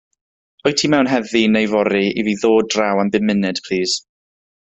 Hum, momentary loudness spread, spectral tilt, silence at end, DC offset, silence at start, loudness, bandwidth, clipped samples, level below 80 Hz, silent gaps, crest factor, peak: none; 5 LU; -4.5 dB/octave; 0.65 s; under 0.1%; 0.65 s; -17 LUFS; 8.2 kHz; under 0.1%; -56 dBFS; none; 16 dB; -2 dBFS